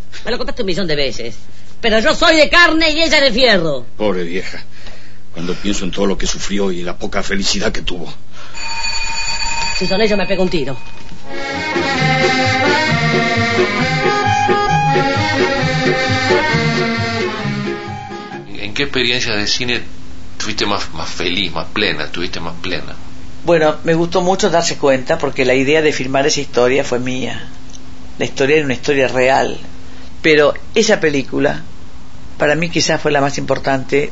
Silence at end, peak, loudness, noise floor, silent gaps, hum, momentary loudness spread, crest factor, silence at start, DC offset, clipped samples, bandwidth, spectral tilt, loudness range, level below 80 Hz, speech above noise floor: 0 s; 0 dBFS; -15 LUFS; -37 dBFS; none; none; 13 LU; 16 dB; 0 s; 8%; under 0.1%; 8 kHz; -4 dB/octave; 7 LU; -32 dBFS; 22 dB